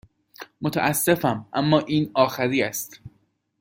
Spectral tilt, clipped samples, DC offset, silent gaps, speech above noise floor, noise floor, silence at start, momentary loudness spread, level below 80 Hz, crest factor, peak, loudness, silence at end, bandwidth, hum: -5 dB/octave; under 0.1%; under 0.1%; none; 43 dB; -66 dBFS; 0.4 s; 13 LU; -60 dBFS; 20 dB; -4 dBFS; -22 LUFS; 0.5 s; 17 kHz; none